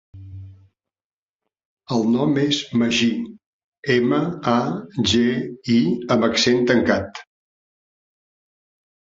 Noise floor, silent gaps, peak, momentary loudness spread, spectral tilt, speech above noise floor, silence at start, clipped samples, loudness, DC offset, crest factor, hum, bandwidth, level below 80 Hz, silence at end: -83 dBFS; 1.04-1.39 s, 1.65-1.77 s, 3.46-3.72 s, 3.79-3.83 s; -2 dBFS; 17 LU; -5 dB/octave; 64 dB; 0.15 s; under 0.1%; -20 LUFS; under 0.1%; 20 dB; none; 7.8 kHz; -50 dBFS; 2 s